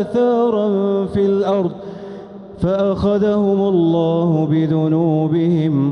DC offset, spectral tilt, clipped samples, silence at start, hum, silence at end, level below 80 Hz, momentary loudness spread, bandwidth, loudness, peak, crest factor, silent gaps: under 0.1%; -9.5 dB/octave; under 0.1%; 0 s; none; 0 s; -44 dBFS; 12 LU; 6.4 kHz; -16 LUFS; -6 dBFS; 10 dB; none